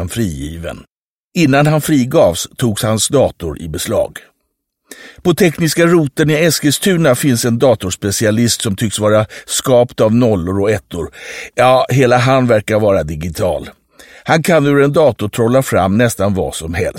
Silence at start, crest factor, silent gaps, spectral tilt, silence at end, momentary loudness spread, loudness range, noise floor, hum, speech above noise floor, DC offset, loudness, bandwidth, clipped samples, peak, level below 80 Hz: 0 s; 14 dB; 0.92-1.31 s; -5 dB/octave; 0 s; 12 LU; 3 LU; -70 dBFS; none; 57 dB; under 0.1%; -13 LUFS; 16.5 kHz; under 0.1%; 0 dBFS; -40 dBFS